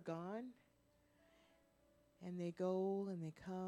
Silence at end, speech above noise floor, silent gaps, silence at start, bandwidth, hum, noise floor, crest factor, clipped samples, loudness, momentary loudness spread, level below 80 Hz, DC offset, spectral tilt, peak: 0 s; 31 dB; none; 0 s; 10.5 kHz; none; -76 dBFS; 18 dB; under 0.1%; -45 LUFS; 12 LU; -82 dBFS; under 0.1%; -8 dB/octave; -30 dBFS